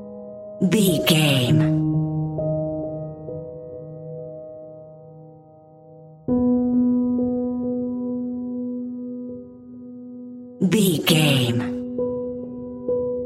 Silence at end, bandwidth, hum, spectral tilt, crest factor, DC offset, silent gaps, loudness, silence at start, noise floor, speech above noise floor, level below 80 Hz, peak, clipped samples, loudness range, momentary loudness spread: 0 s; 16 kHz; none; -5.5 dB/octave; 20 dB; under 0.1%; none; -22 LUFS; 0 s; -48 dBFS; 30 dB; -52 dBFS; -2 dBFS; under 0.1%; 10 LU; 21 LU